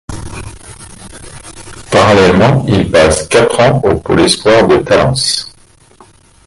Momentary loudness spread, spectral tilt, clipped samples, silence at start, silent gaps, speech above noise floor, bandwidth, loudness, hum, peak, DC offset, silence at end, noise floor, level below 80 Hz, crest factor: 23 LU; -5 dB/octave; under 0.1%; 0.1 s; none; 34 dB; 11.5 kHz; -9 LUFS; none; 0 dBFS; under 0.1%; 1 s; -43 dBFS; -32 dBFS; 12 dB